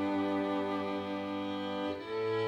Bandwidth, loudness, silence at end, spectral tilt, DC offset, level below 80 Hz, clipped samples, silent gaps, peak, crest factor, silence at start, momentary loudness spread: 10 kHz; -35 LUFS; 0 s; -7 dB/octave; under 0.1%; -74 dBFS; under 0.1%; none; -22 dBFS; 12 dB; 0 s; 4 LU